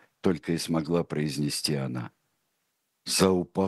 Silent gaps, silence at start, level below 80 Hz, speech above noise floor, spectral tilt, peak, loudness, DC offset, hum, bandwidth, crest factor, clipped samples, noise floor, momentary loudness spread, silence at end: none; 0.25 s; -60 dBFS; 50 dB; -5 dB/octave; -8 dBFS; -28 LUFS; under 0.1%; none; 12.5 kHz; 22 dB; under 0.1%; -77 dBFS; 12 LU; 0 s